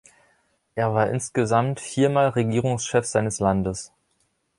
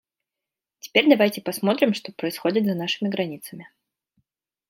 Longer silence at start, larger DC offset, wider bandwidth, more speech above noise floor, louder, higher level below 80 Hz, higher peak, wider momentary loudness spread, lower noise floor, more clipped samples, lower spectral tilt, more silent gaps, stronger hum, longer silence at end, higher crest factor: about the same, 0.75 s vs 0.85 s; neither; second, 11.5 kHz vs 16.5 kHz; second, 48 dB vs 65 dB; about the same, -23 LUFS vs -22 LUFS; first, -50 dBFS vs -74 dBFS; second, -6 dBFS vs -2 dBFS; second, 8 LU vs 13 LU; second, -70 dBFS vs -88 dBFS; neither; about the same, -5.5 dB/octave vs -5 dB/octave; neither; neither; second, 0.75 s vs 1.05 s; about the same, 18 dB vs 22 dB